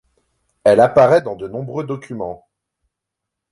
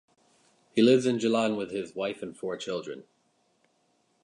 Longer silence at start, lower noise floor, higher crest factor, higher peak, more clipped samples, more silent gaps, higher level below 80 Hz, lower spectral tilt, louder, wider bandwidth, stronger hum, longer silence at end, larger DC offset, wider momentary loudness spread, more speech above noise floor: about the same, 0.65 s vs 0.75 s; first, -81 dBFS vs -71 dBFS; about the same, 16 dB vs 20 dB; first, -2 dBFS vs -10 dBFS; neither; neither; first, -54 dBFS vs -74 dBFS; first, -7 dB/octave vs -5.5 dB/octave; first, -16 LUFS vs -28 LUFS; about the same, 11.5 kHz vs 11 kHz; neither; about the same, 1.15 s vs 1.2 s; neither; first, 17 LU vs 14 LU; first, 66 dB vs 44 dB